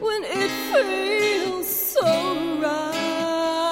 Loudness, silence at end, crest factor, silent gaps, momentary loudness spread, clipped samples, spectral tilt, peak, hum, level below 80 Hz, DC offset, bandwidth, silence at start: -22 LUFS; 0 s; 16 dB; none; 4 LU; under 0.1%; -3 dB/octave; -8 dBFS; none; -58 dBFS; under 0.1%; 16.5 kHz; 0 s